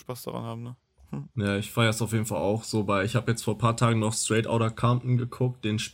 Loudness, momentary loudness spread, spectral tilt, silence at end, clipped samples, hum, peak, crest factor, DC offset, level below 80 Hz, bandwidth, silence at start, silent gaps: -27 LUFS; 12 LU; -5.5 dB/octave; 0 s; under 0.1%; none; -8 dBFS; 18 dB; under 0.1%; -56 dBFS; 16.5 kHz; 0.1 s; none